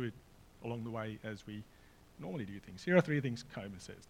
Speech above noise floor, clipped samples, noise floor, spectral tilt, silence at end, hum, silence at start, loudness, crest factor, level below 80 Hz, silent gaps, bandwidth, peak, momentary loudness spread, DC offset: 22 dB; under 0.1%; -60 dBFS; -7 dB/octave; 0.05 s; none; 0 s; -38 LUFS; 26 dB; -64 dBFS; none; 16 kHz; -14 dBFS; 18 LU; under 0.1%